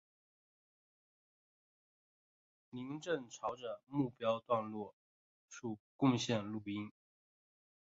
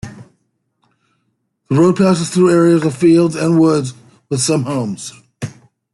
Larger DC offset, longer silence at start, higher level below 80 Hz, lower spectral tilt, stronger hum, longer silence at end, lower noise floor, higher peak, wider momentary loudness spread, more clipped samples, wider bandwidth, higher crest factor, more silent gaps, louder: neither; first, 2.75 s vs 0.05 s; second, -78 dBFS vs -54 dBFS; about the same, -5.5 dB/octave vs -6 dB/octave; neither; first, 1 s vs 0.45 s; first, under -90 dBFS vs -67 dBFS; second, -20 dBFS vs -2 dBFS; second, 15 LU vs 18 LU; neither; second, 7.4 kHz vs 12 kHz; first, 22 dB vs 14 dB; first, 4.93-5.48 s, 5.80-5.99 s vs none; second, -40 LUFS vs -14 LUFS